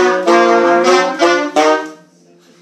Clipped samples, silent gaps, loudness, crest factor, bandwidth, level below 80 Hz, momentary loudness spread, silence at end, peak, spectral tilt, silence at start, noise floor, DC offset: under 0.1%; none; -11 LUFS; 12 dB; 12 kHz; -68 dBFS; 5 LU; 0.7 s; 0 dBFS; -3 dB/octave; 0 s; -47 dBFS; under 0.1%